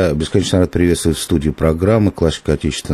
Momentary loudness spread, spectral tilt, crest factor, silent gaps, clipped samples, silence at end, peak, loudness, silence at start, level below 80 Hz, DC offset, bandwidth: 4 LU; -6 dB/octave; 14 dB; none; under 0.1%; 0 s; -2 dBFS; -16 LUFS; 0 s; -30 dBFS; under 0.1%; 14 kHz